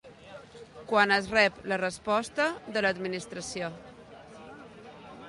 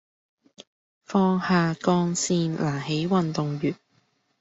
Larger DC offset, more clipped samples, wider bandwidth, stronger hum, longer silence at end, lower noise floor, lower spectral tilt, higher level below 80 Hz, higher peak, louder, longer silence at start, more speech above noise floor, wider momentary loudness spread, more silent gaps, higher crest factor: neither; neither; first, 11.5 kHz vs 8 kHz; neither; second, 0 s vs 0.65 s; second, -49 dBFS vs -67 dBFS; second, -3.5 dB/octave vs -5.5 dB/octave; about the same, -62 dBFS vs -62 dBFS; about the same, -10 dBFS vs -8 dBFS; second, -28 LUFS vs -24 LUFS; second, 0.05 s vs 0.6 s; second, 21 dB vs 44 dB; first, 25 LU vs 6 LU; second, none vs 0.67-1.01 s; first, 22 dB vs 16 dB